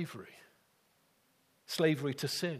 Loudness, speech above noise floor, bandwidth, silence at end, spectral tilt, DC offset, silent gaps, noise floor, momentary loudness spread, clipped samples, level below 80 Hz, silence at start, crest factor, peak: -34 LUFS; 38 dB; 15.5 kHz; 0 s; -5 dB/octave; under 0.1%; none; -72 dBFS; 19 LU; under 0.1%; -80 dBFS; 0 s; 22 dB; -16 dBFS